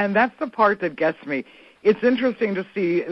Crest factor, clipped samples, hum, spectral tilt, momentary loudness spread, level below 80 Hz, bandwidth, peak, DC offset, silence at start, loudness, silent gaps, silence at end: 18 dB; under 0.1%; none; -8 dB/octave; 7 LU; -62 dBFS; 6 kHz; -4 dBFS; under 0.1%; 0 s; -22 LUFS; none; 0 s